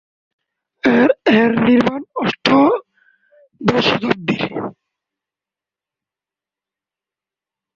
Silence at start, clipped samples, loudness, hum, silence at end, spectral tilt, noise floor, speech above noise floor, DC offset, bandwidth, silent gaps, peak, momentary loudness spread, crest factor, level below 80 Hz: 0.85 s; under 0.1%; -16 LUFS; none; 3.05 s; -6.5 dB/octave; -89 dBFS; 73 dB; under 0.1%; 7.2 kHz; none; 0 dBFS; 9 LU; 18 dB; -56 dBFS